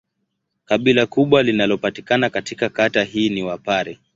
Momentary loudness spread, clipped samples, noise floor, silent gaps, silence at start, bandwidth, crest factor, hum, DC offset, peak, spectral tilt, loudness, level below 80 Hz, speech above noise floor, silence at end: 7 LU; under 0.1%; -74 dBFS; none; 0.7 s; 7.8 kHz; 18 dB; none; under 0.1%; -2 dBFS; -5.5 dB/octave; -18 LUFS; -56 dBFS; 56 dB; 0.2 s